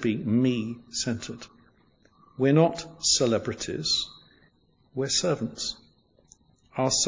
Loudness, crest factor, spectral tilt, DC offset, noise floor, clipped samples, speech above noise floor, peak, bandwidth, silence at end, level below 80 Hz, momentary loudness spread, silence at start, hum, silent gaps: -26 LUFS; 20 dB; -4 dB/octave; under 0.1%; -64 dBFS; under 0.1%; 38 dB; -8 dBFS; 7.8 kHz; 0 s; -58 dBFS; 17 LU; 0 s; none; none